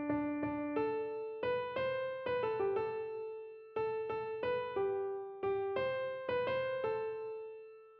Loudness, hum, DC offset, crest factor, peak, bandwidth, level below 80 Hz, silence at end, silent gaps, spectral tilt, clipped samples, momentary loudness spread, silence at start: -38 LUFS; none; under 0.1%; 14 dB; -24 dBFS; 5.6 kHz; -70 dBFS; 0 s; none; -4 dB/octave; under 0.1%; 8 LU; 0 s